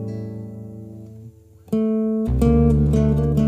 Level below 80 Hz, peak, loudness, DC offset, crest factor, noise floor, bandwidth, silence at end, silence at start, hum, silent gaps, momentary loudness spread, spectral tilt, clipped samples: -28 dBFS; -4 dBFS; -19 LUFS; under 0.1%; 16 dB; -44 dBFS; 13 kHz; 0 s; 0 s; none; none; 21 LU; -10 dB/octave; under 0.1%